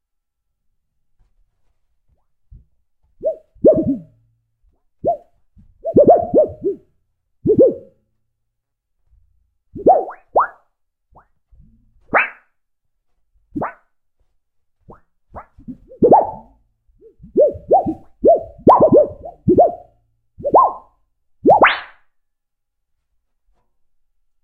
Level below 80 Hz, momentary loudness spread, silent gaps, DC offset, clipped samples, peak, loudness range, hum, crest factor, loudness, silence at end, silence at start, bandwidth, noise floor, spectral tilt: -48 dBFS; 17 LU; none; under 0.1%; under 0.1%; 0 dBFS; 11 LU; none; 20 dB; -16 LUFS; 2.6 s; 3.25 s; 4.7 kHz; -74 dBFS; -9.5 dB/octave